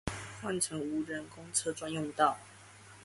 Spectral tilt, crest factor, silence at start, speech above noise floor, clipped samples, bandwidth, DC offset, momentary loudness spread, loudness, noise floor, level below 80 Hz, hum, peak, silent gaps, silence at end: -3.5 dB/octave; 22 dB; 0.05 s; 20 dB; under 0.1%; 12 kHz; under 0.1%; 18 LU; -34 LUFS; -55 dBFS; -60 dBFS; none; -14 dBFS; none; 0 s